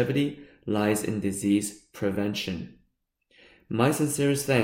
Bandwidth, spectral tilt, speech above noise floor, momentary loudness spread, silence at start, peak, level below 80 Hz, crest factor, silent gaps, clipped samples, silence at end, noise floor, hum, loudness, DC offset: 16.5 kHz; -5 dB/octave; 46 dB; 11 LU; 0 s; -8 dBFS; -60 dBFS; 20 dB; none; under 0.1%; 0 s; -72 dBFS; none; -27 LUFS; under 0.1%